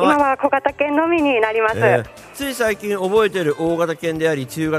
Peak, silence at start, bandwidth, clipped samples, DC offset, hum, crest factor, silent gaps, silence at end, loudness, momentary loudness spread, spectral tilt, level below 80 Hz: -2 dBFS; 0 s; 15.5 kHz; under 0.1%; under 0.1%; none; 16 dB; none; 0 s; -18 LUFS; 5 LU; -5.5 dB/octave; -50 dBFS